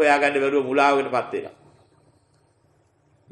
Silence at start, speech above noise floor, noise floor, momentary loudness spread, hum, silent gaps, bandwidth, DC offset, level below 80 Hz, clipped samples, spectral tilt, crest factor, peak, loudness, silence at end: 0 s; 42 dB; -62 dBFS; 13 LU; none; none; 10 kHz; under 0.1%; -72 dBFS; under 0.1%; -4.5 dB/octave; 18 dB; -4 dBFS; -21 LUFS; 1.8 s